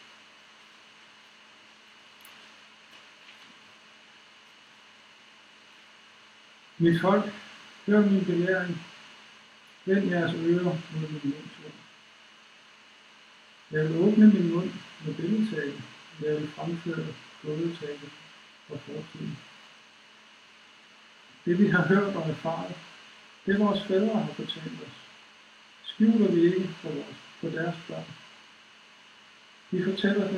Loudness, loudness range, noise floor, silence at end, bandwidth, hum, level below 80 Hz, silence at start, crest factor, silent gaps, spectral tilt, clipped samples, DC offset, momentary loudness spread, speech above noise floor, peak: -27 LUFS; 11 LU; -54 dBFS; 0 s; 8.8 kHz; none; -72 dBFS; 2.25 s; 22 dB; none; -7.5 dB/octave; under 0.1%; under 0.1%; 26 LU; 28 dB; -8 dBFS